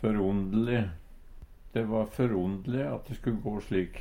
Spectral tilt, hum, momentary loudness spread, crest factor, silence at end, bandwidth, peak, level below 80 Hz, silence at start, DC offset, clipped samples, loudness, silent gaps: -8.5 dB/octave; none; 7 LU; 16 dB; 0 s; 16 kHz; -14 dBFS; -46 dBFS; 0 s; under 0.1%; under 0.1%; -31 LUFS; none